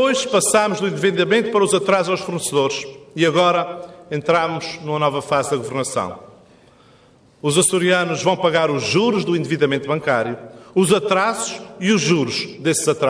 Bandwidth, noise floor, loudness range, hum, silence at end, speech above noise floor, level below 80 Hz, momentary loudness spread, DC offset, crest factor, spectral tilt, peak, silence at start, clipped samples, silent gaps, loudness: 11 kHz; -51 dBFS; 4 LU; none; 0 s; 33 dB; -60 dBFS; 10 LU; under 0.1%; 16 dB; -4 dB/octave; -4 dBFS; 0 s; under 0.1%; none; -18 LUFS